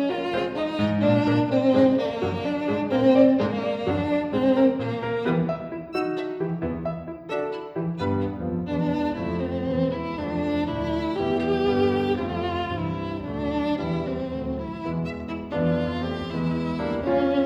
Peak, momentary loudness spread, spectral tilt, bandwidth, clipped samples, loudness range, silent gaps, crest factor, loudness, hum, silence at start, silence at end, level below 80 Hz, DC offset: -6 dBFS; 10 LU; -8.5 dB/octave; 7.8 kHz; under 0.1%; 7 LU; none; 18 dB; -25 LUFS; none; 0 s; 0 s; -46 dBFS; under 0.1%